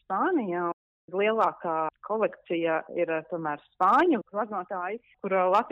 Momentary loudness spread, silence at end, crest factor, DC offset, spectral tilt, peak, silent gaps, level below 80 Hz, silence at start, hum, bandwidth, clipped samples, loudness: 11 LU; 0 s; 16 dB; under 0.1%; -7 dB/octave; -12 dBFS; 0.73-1.08 s; -72 dBFS; 0.1 s; none; 8 kHz; under 0.1%; -28 LUFS